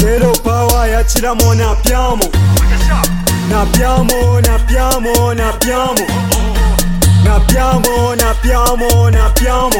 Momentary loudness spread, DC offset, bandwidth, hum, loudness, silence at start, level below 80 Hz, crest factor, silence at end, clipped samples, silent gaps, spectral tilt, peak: 3 LU; under 0.1%; 17 kHz; none; -12 LUFS; 0 s; -14 dBFS; 10 dB; 0 s; under 0.1%; none; -5 dB/octave; 0 dBFS